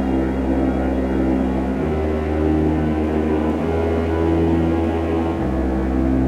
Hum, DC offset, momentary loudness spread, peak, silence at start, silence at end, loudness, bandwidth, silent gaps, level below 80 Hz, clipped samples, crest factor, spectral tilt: none; under 0.1%; 3 LU; -6 dBFS; 0 s; 0 s; -20 LUFS; 10 kHz; none; -26 dBFS; under 0.1%; 12 dB; -9 dB/octave